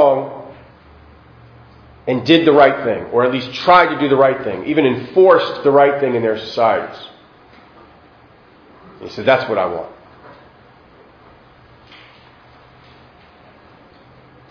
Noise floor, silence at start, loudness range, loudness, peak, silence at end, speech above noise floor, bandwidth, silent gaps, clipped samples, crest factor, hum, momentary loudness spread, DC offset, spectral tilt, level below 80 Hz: -47 dBFS; 0 s; 9 LU; -14 LUFS; 0 dBFS; 4.6 s; 33 dB; 5.4 kHz; none; under 0.1%; 18 dB; none; 19 LU; under 0.1%; -7 dB/octave; -54 dBFS